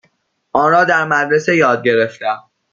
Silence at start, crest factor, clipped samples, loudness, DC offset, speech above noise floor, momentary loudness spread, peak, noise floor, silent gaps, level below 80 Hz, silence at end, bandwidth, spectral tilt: 0.55 s; 14 dB; under 0.1%; -14 LUFS; under 0.1%; 48 dB; 10 LU; -2 dBFS; -61 dBFS; none; -60 dBFS; 0.35 s; 7.4 kHz; -5.5 dB/octave